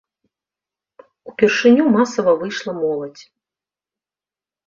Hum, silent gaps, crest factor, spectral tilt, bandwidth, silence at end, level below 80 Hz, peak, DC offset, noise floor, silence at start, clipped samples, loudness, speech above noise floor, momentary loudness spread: none; none; 18 dB; -5 dB/octave; 7.6 kHz; 1.45 s; -64 dBFS; -2 dBFS; under 0.1%; under -90 dBFS; 1.25 s; under 0.1%; -17 LUFS; over 74 dB; 14 LU